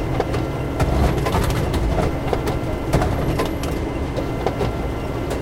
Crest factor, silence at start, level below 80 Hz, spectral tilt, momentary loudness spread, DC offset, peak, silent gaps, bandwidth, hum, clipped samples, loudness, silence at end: 18 dB; 0 s; -26 dBFS; -6.5 dB/octave; 5 LU; under 0.1%; -4 dBFS; none; 16.5 kHz; none; under 0.1%; -22 LUFS; 0 s